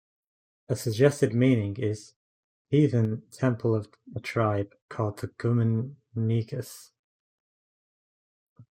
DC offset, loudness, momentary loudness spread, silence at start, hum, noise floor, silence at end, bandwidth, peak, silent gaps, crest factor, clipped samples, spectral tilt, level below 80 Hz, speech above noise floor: under 0.1%; -27 LUFS; 14 LU; 0.7 s; none; under -90 dBFS; 0.15 s; 15.5 kHz; -8 dBFS; 2.16-2.65 s, 4.82-4.89 s, 6.99-8.56 s; 20 dB; under 0.1%; -7.5 dB/octave; -66 dBFS; over 64 dB